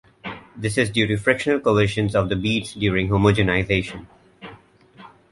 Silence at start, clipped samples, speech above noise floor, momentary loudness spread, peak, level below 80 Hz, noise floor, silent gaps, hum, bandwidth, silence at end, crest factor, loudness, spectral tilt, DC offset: 0.25 s; under 0.1%; 28 dB; 17 LU; -2 dBFS; -42 dBFS; -48 dBFS; none; none; 11.5 kHz; 0.25 s; 20 dB; -20 LUFS; -6 dB/octave; under 0.1%